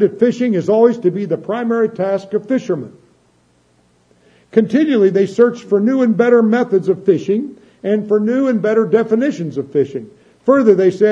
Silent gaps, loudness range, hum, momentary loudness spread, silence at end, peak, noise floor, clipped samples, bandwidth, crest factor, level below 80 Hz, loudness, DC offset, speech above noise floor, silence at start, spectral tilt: none; 6 LU; 60 Hz at -55 dBFS; 9 LU; 0 s; 0 dBFS; -56 dBFS; under 0.1%; 8 kHz; 14 dB; -66 dBFS; -15 LUFS; under 0.1%; 42 dB; 0 s; -8 dB/octave